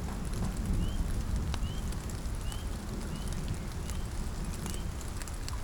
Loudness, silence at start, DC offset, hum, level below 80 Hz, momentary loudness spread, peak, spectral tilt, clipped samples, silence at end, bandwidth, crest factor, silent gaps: -37 LUFS; 0 s; under 0.1%; none; -36 dBFS; 5 LU; -16 dBFS; -5 dB/octave; under 0.1%; 0 s; over 20 kHz; 18 dB; none